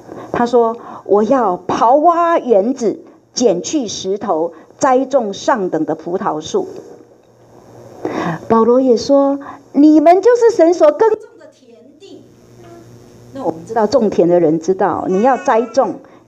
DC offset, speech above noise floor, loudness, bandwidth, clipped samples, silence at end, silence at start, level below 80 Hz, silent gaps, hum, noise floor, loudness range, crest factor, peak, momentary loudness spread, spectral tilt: under 0.1%; 33 dB; -14 LUFS; 8.6 kHz; under 0.1%; 0.3 s; 0.1 s; -56 dBFS; none; none; -46 dBFS; 7 LU; 14 dB; 0 dBFS; 13 LU; -5.5 dB/octave